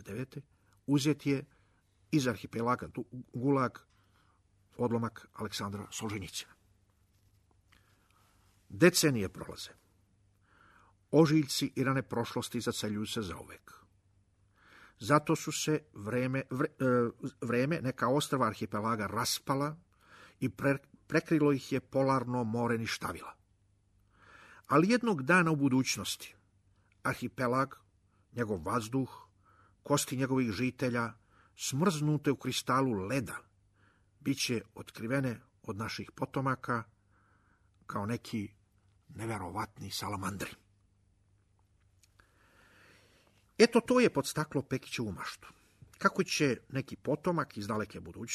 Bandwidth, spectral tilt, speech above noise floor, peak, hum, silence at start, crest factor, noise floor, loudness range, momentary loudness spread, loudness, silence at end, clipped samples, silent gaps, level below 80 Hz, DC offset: 13.5 kHz; -5 dB/octave; 38 dB; -10 dBFS; 50 Hz at -60 dBFS; 0 s; 24 dB; -70 dBFS; 9 LU; 15 LU; -33 LUFS; 0 s; under 0.1%; none; -66 dBFS; under 0.1%